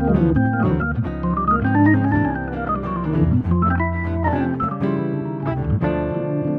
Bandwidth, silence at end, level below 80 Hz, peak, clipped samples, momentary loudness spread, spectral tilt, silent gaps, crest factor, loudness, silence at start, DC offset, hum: 4.4 kHz; 0 s; -32 dBFS; -4 dBFS; under 0.1%; 8 LU; -11 dB/octave; none; 14 dB; -20 LUFS; 0 s; under 0.1%; none